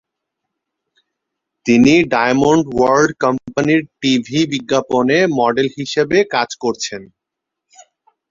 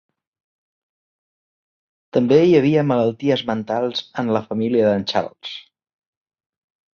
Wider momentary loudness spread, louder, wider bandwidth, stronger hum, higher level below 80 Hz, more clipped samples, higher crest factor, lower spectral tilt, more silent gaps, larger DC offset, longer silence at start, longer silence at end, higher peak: second, 8 LU vs 12 LU; first, -15 LUFS vs -18 LUFS; first, 7.8 kHz vs 7 kHz; neither; first, -50 dBFS vs -60 dBFS; neither; about the same, 16 dB vs 20 dB; second, -5 dB/octave vs -7 dB/octave; neither; neither; second, 1.65 s vs 2.15 s; about the same, 1.25 s vs 1.35 s; about the same, 0 dBFS vs -2 dBFS